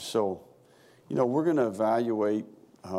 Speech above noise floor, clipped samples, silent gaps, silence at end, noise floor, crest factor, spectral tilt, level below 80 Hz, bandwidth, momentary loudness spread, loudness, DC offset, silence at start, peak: 32 dB; under 0.1%; none; 0 s; -58 dBFS; 16 dB; -6.5 dB/octave; -76 dBFS; 15 kHz; 15 LU; -28 LUFS; under 0.1%; 0 s; -12 dBFS